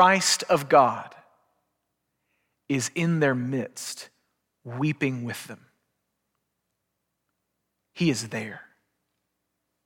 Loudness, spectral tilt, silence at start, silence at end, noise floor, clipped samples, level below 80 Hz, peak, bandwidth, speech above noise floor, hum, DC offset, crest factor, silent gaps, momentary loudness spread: -25 LUFS; -4 dB/octave; 0 s; 1.25 s; -80 dBFS; under 0.1%; -74 dBFS; -6 dBFS; 17 kHz; 56 dB; none; under 0.1%; 22 dB; none; 19 LU